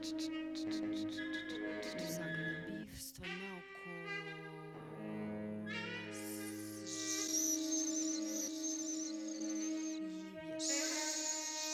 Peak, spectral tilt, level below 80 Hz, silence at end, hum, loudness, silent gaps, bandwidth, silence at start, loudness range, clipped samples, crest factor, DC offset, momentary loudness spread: -24 dBFS; -2.5 dB/octave; -72 dBFS; 0 s; none; -40 LUFS; none; 16 kHz; 0 s; 7 LU; under 0.1%; 18 dB; under 0.1%; 11 LU